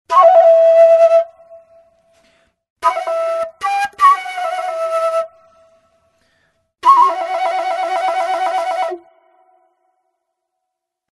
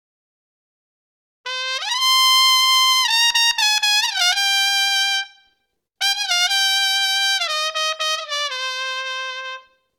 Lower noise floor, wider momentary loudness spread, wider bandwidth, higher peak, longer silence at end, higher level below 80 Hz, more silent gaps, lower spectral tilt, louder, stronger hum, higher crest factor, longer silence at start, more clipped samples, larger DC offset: first, -78 dBFS vs -71 dBFS; about the same, 13 LU vs 13 LU; second, 12 kHz vs 19 kHz; first, 0 dBFS vs -4 dBFS; first, 2.15 s vs 0.4 s; about the same, -68 dBFS vs -70 dBFS; first, 2.70-2.76 s vs none; first, -1.5 dB/octave vs 7 dB/octave; about the same, -14 LUFS vs -16 LUFS; neither; about the same, 16 dB vs 18 dB; second, 0.1 s vs 1.45 s; neither; neither